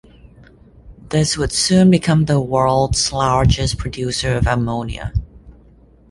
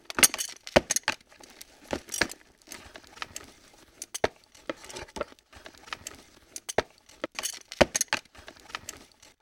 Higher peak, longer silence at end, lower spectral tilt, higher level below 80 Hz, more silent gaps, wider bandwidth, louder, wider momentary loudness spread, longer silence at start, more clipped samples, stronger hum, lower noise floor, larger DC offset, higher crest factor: about the same, -2 dBFS vs -2 dBFS; first, 0.6 s vs 0.4 s; first, -5 dB/octave vs -1.5 dB/octave; first, -30 dBFS vs -54 dBFS; neither; second, 11.5 kHz vs over 20 kHz; first, -17 LUFS vs -29 LUFS; second, 11 LU vs 24 LU; first, 0.85 s vs 0.15 s; neither; neither; second, -48 dBFS vs -56 dBFS; neither; second, 16 dB vs 30 dB